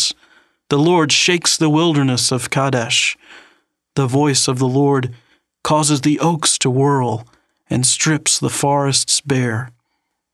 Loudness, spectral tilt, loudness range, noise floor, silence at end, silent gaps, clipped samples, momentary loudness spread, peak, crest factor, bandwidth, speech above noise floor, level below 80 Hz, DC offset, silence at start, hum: -15 LUFS; -3.5 dB/octave; 2 LU; -72 dBFS; 0.65 s; none; under 0.1%; 9 LU; -2 dBFS; 16 dB; 13.5 kHz; 56 dB; -58 dBFS; under 0.1%; 0 s; none